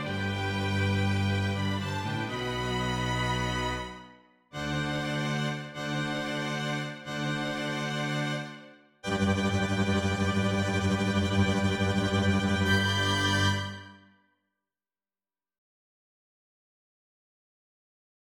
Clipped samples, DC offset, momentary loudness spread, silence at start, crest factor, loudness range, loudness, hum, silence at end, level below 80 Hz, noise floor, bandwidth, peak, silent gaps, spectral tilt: under 0.1%; under 0.1%; 8 LU; 0 s; 18 dB; 6 LU; -29 LUFS; none; 4.4 s; -52 dBFS; under -90 dBFS; 15 kHz; -14 dBFS; none; -5 dB/octave